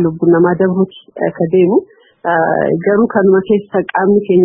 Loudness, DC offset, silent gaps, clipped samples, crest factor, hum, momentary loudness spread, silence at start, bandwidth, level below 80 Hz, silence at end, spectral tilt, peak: -13 LUFS; under 0.1%; none; under 0.1%; 12 dB; none; 7 LU; 0 s; 3.6 kHz; -54 dBFS; 0 s; -13.5 dB/octave; 0 dBFS